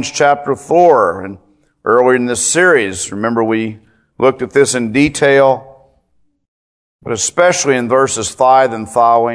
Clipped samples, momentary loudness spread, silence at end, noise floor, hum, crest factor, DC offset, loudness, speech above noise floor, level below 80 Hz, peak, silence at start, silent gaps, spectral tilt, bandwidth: 0.2%; 9 LU; 0 s; -59 dBFS; none; 14 dB; under 0.1%; -12 LUFS; 47 dB; -50 dBFS; 0 dBFS; 0 s; 6.48-6.99 s; -3.5 dB/octave; 11 kHz